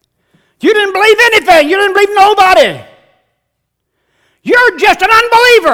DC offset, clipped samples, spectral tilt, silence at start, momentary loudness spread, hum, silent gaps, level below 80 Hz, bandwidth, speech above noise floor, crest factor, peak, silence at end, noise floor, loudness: under 0.1%; 2%; -2 dB/octave; 0.65 s; 7 LU; none; none; -44 dBFS; over 20 kHz; 62 dB; 10 dB; 0 dBFS; 0 s; -69 dBFS; -7 LUFS